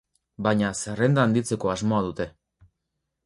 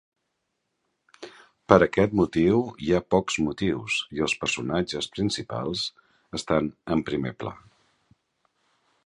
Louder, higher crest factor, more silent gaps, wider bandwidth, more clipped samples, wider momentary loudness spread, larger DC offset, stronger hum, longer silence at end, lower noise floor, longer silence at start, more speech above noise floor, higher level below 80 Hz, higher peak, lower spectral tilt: about the same, -25 LUFS vs -25 LUFS; second, 18 dB vs 26 dB; neither; about the same, 11.5 kHz vs 11 kHz; neither; second, 9 LU vs 15 LU; neither; neither; second, 0.95 s vs 1.5 s; about the same, -80 dBFS vs -78 dBFS; second, 0.4 s vs 1.2 s; about the same, 57 dB vs 54 dB; about the same, -54 dBFS vs -50 dBFS; second, -8 dBFS vs 0 dBFS; about the same, -6 dB/octave vs -5 dB/octave